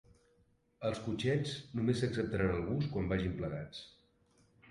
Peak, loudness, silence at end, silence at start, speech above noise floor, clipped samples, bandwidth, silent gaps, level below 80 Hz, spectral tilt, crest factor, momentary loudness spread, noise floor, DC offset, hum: -18 dBFS; -36 LUFS; 0.8 s; 0.8 s; 37 dB; under 0.1%; 11.5 kHz; none; -54 dBFS; -7 dB/octave; 18 dB; 9 LU; -72 dBFS; under 0.1%; none